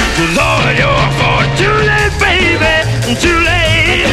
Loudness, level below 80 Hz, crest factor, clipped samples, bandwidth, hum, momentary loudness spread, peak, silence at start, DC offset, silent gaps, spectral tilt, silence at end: -10 LUFS; -22 dBFS; 10 dB; under 0.1%; 14.5 kHz; none; 2 LU; 0 dBFS; 0 s; under 0.1%; none; -4.5 dB/octave; 0 s